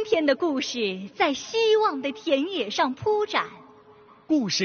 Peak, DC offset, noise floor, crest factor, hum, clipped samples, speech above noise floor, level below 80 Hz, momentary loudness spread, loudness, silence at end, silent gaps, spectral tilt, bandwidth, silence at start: -8 dBFS; under 0.1%; -52 dBFS; 18 dB; none; under 0.1%; 28 dB; -66 dBFS; 6 LU; -24 LUFS; 0 s; none; -2 dB/octave; 6.8 kHz; 0 s